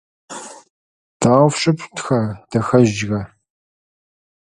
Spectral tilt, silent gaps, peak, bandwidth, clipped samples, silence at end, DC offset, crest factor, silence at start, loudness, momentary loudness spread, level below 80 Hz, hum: -6 dB/octave; 0.70-1.20 s; 0 dBFS; 11.5 kHz; under 0.1%; 1.15 s; under 0.1%; 18 dB; 0.3 s; -17 LUFS; 20 LU; -50 dBFS; none